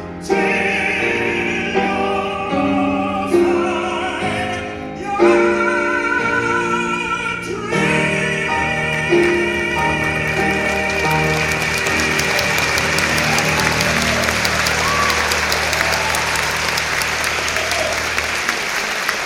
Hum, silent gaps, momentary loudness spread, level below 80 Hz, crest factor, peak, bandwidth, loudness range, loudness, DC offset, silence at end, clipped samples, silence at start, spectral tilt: none; none; 5 LU; -38 dBFS; 16 dB; 0 dBFS; 16.5 kHz; 2 LU; -17 LUFS; under 0.1%; 0 s; under 0.1%; 0 s; -3.5 dB/octave